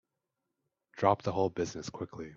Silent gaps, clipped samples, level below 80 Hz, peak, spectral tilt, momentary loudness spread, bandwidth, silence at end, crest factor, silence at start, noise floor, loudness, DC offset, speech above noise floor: none; under 0.1%; -66 dBFS; -12 dBFS; -6 dB/octave; 12 LU; 7.8 kHz; 0 s; 24 dB; 0.95 s; -86 dBFS; -33 LUFS; under 0.1%; 54 dB